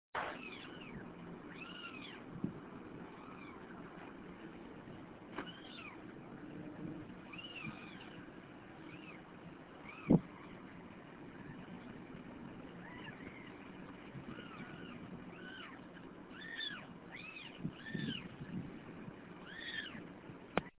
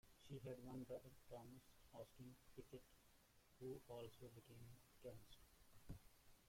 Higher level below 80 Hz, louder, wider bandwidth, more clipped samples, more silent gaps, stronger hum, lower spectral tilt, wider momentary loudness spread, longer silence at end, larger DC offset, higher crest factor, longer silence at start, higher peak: first, -68 dBFS vs -74 dBFS; first, -47 LUFS vs -60 LUFS; second, 4 kHz vs 16.5 kHz; neither; neither; neither; second, -4.5 dB/octave vs -6 dB/octave; about the same, 11 LU vs 10 LU; about the same, 0 s vs 0 s; neither; first, 32 dB vs 18 dB; about the same, 0.15 s vs 0.05 s; first, -16 dBFS vs -42 dBFS